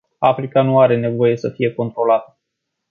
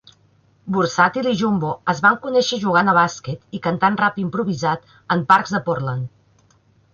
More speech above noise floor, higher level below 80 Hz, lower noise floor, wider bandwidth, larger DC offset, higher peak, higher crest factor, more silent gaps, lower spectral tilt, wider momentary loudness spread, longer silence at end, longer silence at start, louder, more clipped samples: first, 61 dB vs 38 dB; about the same, -60 dBFS vs -58 dBFS; first, -77 dBFS vs -57 dBFS; second, 6.8 kHz vs 8 kHz; neither; about the same, -2 dBFS vs -2 dBFS; about the same, 16 dB vs 18 dB; neither; first, -8.5 dB/octave vs -5.5 dB/octave; second, 7 LU vs 11 LU; second, 0.65 s vs 0.85 s; second, 0.2 s vs 0.65 s; about the same, -17 LUFS vs -19 LUFS; neither